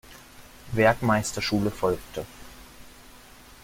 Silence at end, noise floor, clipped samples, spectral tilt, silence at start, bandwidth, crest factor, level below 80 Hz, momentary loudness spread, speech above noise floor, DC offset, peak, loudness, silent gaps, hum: 0.45 s; -49 dBFS; under 0.1%; -5 dB/octave; 0.1 s; 16.5 kHz; 22 dB; -48 dBFS; 25 LU; 25 dB; under 0.1%; -6 dBFS; -25 LUFS; none; none